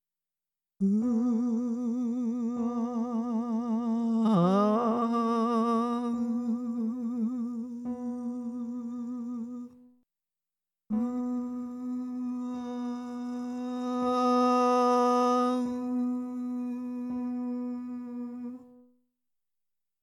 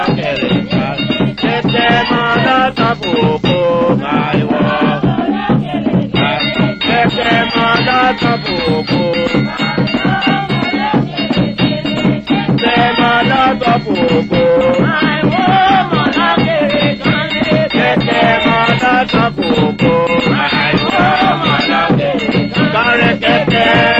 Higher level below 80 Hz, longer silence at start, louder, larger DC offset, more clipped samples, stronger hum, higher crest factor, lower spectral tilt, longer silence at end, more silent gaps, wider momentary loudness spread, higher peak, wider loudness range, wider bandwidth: second, -74 dBFS vs -38 dBFS; first, 0.8 s vs 0 s; second, -30 LUFS vs -12 LUFS; neither; neither; neither; about the same, 16 dB vs 12 dB; about the same, -7.5 dB/octave vs -7 dB/octave; first, 1.3 s vs 0 s; neither; first, 12 LU vs 4 LU; second, -14 dBFS vs 0 dBFS; first, 10 LU vs 2 LU; first, 10.5 kHz vs 8 kHz